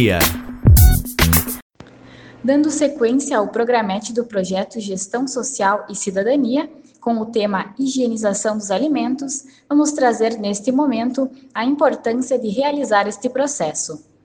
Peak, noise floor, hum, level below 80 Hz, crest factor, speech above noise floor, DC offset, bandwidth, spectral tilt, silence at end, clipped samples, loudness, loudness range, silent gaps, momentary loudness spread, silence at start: 0 dBFS; -42 dBFS; none; -26 dBFS; 18 dB; 23 dB; under 0.1%; 18 kHz; -5 dB/octave; 0.3 s; under 0.1%; -18 LUFS; 4 LU; 1.62-1.70 s; 9 LU; 0 s